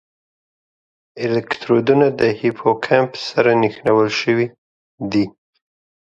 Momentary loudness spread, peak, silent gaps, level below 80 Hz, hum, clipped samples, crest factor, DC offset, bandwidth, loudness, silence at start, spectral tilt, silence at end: 7 LU; 0 dBFS; 4.58-4.98 s; -58 dBFS; none; under 0.1%; 18 dB; under 0.1%; 7.8 kHz; -17 LUFS; 1.15 s; -6.5 dB/octave; 0.8 s